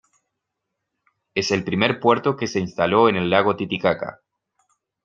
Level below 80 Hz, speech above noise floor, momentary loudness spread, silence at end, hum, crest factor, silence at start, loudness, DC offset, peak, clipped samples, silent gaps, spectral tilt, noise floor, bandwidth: -60 dBFS; 60 dB; 8 LU; 0.95 s; none; 20 dB; 1.35 s; -20 LUFS; under 0.1%; -2 dBFS; under 0.1%; none; -5.5 dB/octave; -80 dBFS; 7.6 kHz